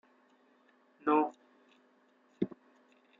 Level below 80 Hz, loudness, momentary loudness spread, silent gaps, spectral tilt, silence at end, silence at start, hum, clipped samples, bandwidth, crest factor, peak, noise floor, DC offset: -82 dBFS; -34 LUFS; 10 LU; none; -6 dB/octave; 0.75 s; 1.05 s; none; under 0.1%; 7 kHz; 24 dB; -14 dBFS; -68 dBFS; under 0.1%